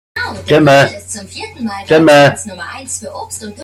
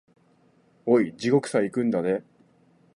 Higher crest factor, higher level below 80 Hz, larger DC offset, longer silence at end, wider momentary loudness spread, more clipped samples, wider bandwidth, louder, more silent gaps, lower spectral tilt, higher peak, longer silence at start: second, 12 dB vs 18 dB; first, -50 dBFS vs -70 dBFS; neither; second, 0 s vs 0.75 s; first, 18 LU vs 7 LU; neither; first, 15.5 kHz vs 11 kHz; first, -11 LUFS vs -25 LUFS; neither; second, -4.5 dB/octave vs -6.5 dB/octave; first, 0 dBFS vs -8 dBFS; second, 0.15 s vs 0.85 s